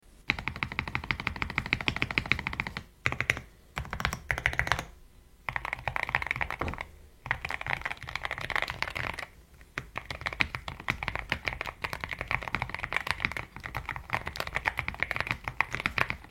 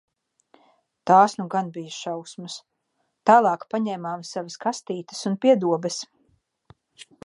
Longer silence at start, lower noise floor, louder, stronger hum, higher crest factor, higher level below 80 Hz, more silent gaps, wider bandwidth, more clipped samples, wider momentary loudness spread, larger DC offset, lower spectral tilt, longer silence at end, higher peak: second, 0.05 s vs 1.05 s; second, -55 dBFS vs -74 dBFS; second, -32 LUFS vs -23 LUFS; neither; first, 30 dB vs 22 dB; first, -46 dBFS vs -76 dBFS; neither; first, 16.5 kHz vs 11.5 kHz; neither; second, 10 LU vs 18 LU; neither; about the same, -4 dB/octave vs -5 dB/octave; second, 0 s vs 0.2 s; about the same, -4 dBFS vs -2 dBFS